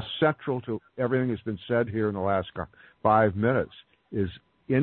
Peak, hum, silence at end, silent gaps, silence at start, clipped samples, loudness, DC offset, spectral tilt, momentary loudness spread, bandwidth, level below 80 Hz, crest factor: -8 dBFS; none; 0 s; none; 0 s; under 0.1%; -27 LUFS; under 0.1%; -11 dB/octave; 14 LU; 4.3 kHz; -56 dBFS; 18 dB